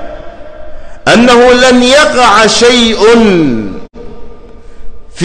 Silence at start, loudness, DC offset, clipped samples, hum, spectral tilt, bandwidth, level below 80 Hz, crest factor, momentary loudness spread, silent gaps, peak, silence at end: 0 s; -5 LUFS; under 0.1%; 0.3%; none; -3.5 dB/octave; 11.5 kHz; -28 dBFS; 8 dB; 13 LU; none; 0 dBFS; 0 s